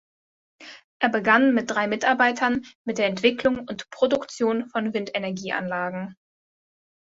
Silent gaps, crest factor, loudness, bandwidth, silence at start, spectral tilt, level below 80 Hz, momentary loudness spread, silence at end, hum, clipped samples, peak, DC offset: 0.84-1.00 s, 2.75-2.85 s; 22 dB; -23 LUFS; 8 kHz; 0.6 s; -4.5 dB/octave; -62 dBFS; 14 LU; 0.9 s; none; under 0.1%; -4 dBFS; under 0.1%